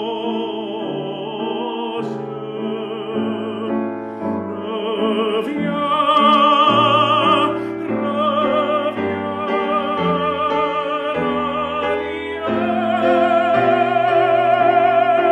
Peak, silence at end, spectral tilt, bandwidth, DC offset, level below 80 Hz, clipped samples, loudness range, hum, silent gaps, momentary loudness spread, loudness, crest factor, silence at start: -2 dBFS; 0 s; -6.5 dB/octave; 9.8 kHz; under 0.1%; -56 dBFS; under 0.1%; 9 LU; none; none; 11 LU; -18 LUFS; 16 dB; 0 s